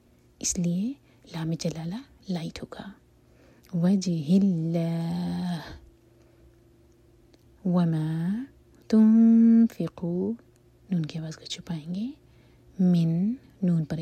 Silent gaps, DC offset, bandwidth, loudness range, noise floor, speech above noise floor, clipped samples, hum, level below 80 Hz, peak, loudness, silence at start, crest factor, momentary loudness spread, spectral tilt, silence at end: none; under 0.1%; 12.5 kHz; 9 LU; -58 dBFS; 33 dB; under 0.1%; none; -58 dBFS; -12 dBFS; -26 LUFS; 0.45 s; 14 dB; 18 LU; -6.5 dB/octave; 0 s